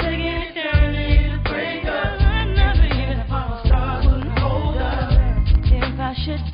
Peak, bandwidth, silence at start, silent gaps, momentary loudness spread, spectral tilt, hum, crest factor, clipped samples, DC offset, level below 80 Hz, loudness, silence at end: -2 dBFS; 5.2 kHz; 0 s; none; 6 LU; -11.5 dB/octave; none; 14 dB; under 0.1%; under 0.1%; -18 dBFS; -20 LUFS; 0 s